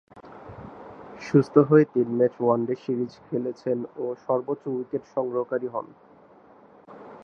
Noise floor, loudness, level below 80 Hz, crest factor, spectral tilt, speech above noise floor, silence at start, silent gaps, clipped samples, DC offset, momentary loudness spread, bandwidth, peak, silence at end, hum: -53 dBFS; -25 LUFS; -66 dBFS; 22 dB; -9 dB/octave; 29 dB; 0.15 s; none; under 0.1%; under 0.1%; 24 LU; 6.8 kHz; -2 dBFS; 0 s; none